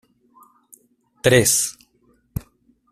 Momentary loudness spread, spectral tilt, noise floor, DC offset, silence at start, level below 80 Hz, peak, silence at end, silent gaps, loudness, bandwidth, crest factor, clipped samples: 20 LU; -3 dB/octave; -61 dBFS; under 0.1%; 1.25 s; -48 dBFS; -2 dBFS; 0.5 s; none; -17 LUFS; 15.5 kHz; 22 dB; under 0.1%